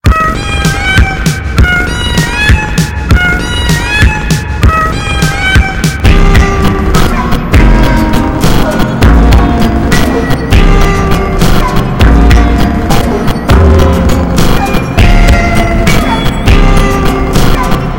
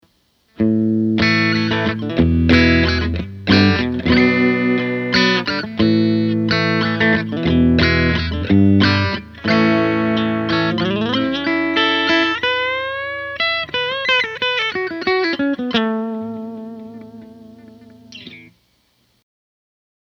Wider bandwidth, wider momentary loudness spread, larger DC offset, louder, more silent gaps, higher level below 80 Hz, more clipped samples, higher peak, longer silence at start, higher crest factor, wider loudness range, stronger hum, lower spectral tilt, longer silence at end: first, 17 kHz vs 7 kHz; second, 4 LU vs 10 LU; neither; first, -8 LUFS vs -16 LUFS; neither; first, -10 dBFS vs -34 dBFS; first, 5% vs under 0.1%; about the same, 0 dBFS vs 0 dBFS; second, 0 s vs 0.6 s; second, 6 dB vs 18 dB; second, 1 LU vs 7 LU; neither; about the same, -5.5 dB/octave vs -6.5 dB/octave; second, 0 s vs 1.65 s